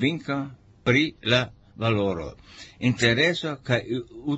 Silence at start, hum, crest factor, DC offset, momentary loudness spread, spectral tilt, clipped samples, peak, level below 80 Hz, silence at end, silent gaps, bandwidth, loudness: 0 s; none; 20 dB; under 0.1%; 14 LU; -5.5 dB/octave; under 0.1%; -6 dBFS; -52 dBFS; 0 s; none; 8.2 kHz; -24 LUFS